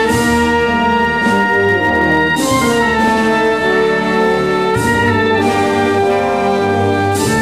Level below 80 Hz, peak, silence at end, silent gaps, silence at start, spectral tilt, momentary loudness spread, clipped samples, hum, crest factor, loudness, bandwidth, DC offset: -36 dBFS; -2 dBFS; 0 s; none; 0 s; -5 dB/octave; 2 LU; under 0.1%; none; 10 dB; -13 LUFS; 16 kHz; 0.5%